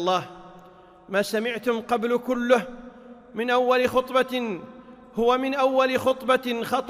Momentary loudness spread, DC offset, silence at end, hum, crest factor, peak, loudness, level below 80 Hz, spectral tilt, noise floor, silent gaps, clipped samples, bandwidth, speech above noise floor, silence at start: 16 LU; under 0.1%; 0 s; none; 18 dB; -6 dBFS; -24 LUFS; -58 dBFS; -4.5 dB/octave; -50 dBFS; none; under 0.1%; 16 kHz; 26 dB; 0 s